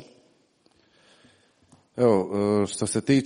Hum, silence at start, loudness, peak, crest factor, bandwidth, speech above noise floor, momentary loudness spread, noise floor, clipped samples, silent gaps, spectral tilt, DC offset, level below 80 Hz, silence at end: none; 0 s; -24 LUFS; -6 dBFS; 20 dB; 10.5 kHz; 41 dB; 5 LU; -64 dBFS; under 0.1%; none; -5.5 dB/octave; under 0.1%; -64 dBFS; 0 s